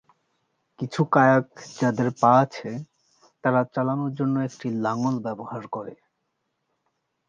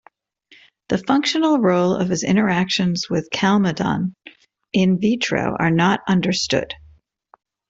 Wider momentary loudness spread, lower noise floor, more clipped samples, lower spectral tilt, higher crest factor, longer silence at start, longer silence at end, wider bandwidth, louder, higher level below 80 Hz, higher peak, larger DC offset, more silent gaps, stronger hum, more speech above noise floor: first, 17 LU vs 7 LU; first, -77 dBFS vs -55 dBFS; neither; first, -7.5 dB/octave vs -5.5 dB/octave; about the same, 20 dB vs 16 dB; about the same, 0.8 s vs 0.9 s; first, 1.35 s vs 0.95 s; about the same, 7.6 kHz vs 8 kHz; second, -23 LUFS vs -19 LUFS; second, -70 dBFS vs -54 dBFS; about the same, -4 dBFS vs -4 dBFS; neither; neither; neither; first, 53 dB vs 37 dB